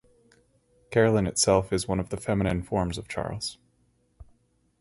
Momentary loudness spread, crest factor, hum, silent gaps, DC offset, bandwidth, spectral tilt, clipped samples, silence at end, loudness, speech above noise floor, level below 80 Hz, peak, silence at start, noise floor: 11 LU; 22 dB; none; none; under 0.1%; 11.5 kHz; -4.5 dB/octave; under 0.1%; 0.6 s; -26 LUFS; 42 dB; -46 dBFS; -6 dBFS; 0.9 s; -68 dBFS